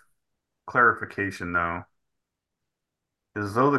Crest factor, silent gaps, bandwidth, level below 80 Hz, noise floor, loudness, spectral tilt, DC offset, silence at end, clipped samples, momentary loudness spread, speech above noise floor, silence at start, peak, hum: 20 dB; none; 12.5 kHz; -54 dBFS; -85 dBFS; -25 LUFS; -7 dB/octave; under 0.1%; 0 s; under 0.1%; 14 LU; 60 dB; 0.65 s; -6 dBFS; none